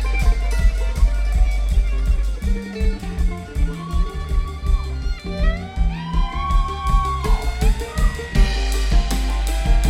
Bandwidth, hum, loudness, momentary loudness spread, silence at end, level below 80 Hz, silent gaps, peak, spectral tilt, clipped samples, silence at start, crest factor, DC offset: 13.5 kHz; none; -23 LUFS; 5 LU; 0 s; -18 dBFS; none; -4 dBFS; -5.5 dB/octave; under 0.1%; 0 s; 14 dB; under 0.1%